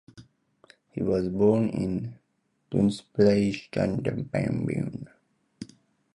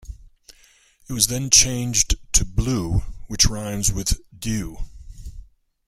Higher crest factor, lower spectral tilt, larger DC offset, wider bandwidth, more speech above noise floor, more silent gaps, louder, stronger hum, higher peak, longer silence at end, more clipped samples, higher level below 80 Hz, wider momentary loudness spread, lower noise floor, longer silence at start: about the same, 20 dB vs 22 dB; first, -8 dB/octave vs -2.5 dB/octave; neither; second, 11 kHz vs 16 kHz; first, 48 dB vs 34 dB; neither; second, -26 LUFS vs -20 LUFS; neither; second, -8 dBFS vs 0 dBFS; about the same, 0.5 s vs 0.45 s; neither; second, -54 dBFS vs -30 dBFS; about the same, 21 LU vs 20 LU; first, -73 dBFS vs -55 dBFS; about the same, 0.15 s vs 0.05 s